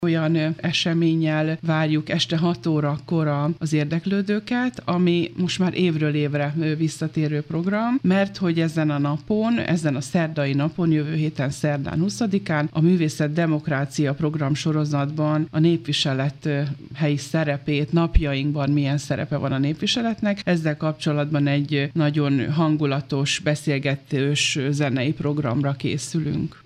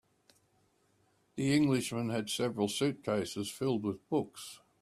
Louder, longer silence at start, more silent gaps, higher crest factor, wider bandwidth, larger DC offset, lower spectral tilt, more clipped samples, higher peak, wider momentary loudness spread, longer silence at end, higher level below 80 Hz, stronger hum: first, -22 LUFS vs -33 LUFS; second, 0 s vs 1.35 s; neither; about the same, 18 dB vs 18 dB; second, 10.5 kHz vs 14.5 kHz; neither; about the same, -6 dB/octave vs -5 dB/octave; neither; first, -4 dBFS vs -16 dBFS; second, 4 LU vs 12 LU; second, 0.1 s vs 0.25 s; first, -40 dBFS vs -70 dBFS; neither